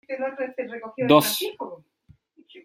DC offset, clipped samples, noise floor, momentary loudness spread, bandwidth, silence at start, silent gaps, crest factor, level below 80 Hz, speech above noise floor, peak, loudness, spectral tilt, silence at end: under 0.1%; under 0.1%; -58 dBFS; 17 LU; 16.5 kHz; 0.1 s; none; 24 dB; -68 dBFS; 35 dB; -2 dBFS; -23 LUFS; -4 dB/octave; 0.05 s